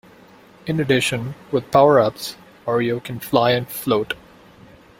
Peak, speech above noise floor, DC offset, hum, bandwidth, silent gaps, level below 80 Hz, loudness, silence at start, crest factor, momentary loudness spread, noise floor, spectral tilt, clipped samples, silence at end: 0 dBFS; 29 dB; under 0.1%; none; 16.5 kHz; none; -56 dBFS; -19 LUFS; 0.65 s; 20 dB; 16 LU; -47 dBFS; -5.5 dB/octave; under 0.1%; 0.85 s